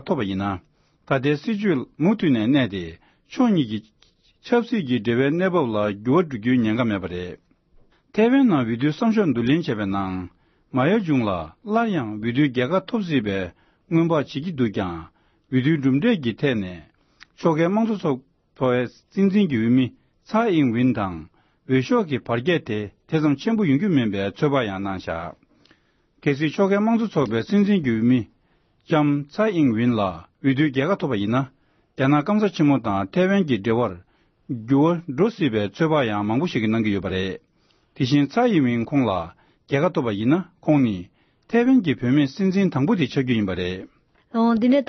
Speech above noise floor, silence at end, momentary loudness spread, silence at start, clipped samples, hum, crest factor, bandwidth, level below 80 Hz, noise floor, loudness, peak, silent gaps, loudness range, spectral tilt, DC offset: 42 dB; 0.05 s; 10 LU; 0.05 s; under 0.1%; none; 16 dB; 6.4 kHz; -58 dBFS; -63 dBFS; -22 LUFS; -6 dBFS; none; 2 LU; -8 dB/octave; under 0.1%